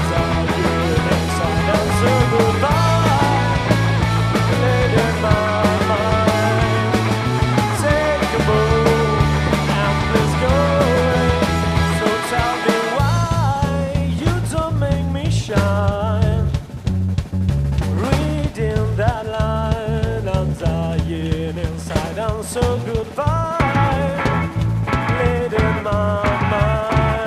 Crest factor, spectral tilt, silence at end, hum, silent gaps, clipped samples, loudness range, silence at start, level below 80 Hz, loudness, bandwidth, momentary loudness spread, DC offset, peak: 16 dB; -6 dB/octave; 0 s; none; none; under 0.1%; 4 LU; 0 s; -28 dBFS; -18 LUFS; 15 kHz; 6 LU; under 0.1%; 0 dBFS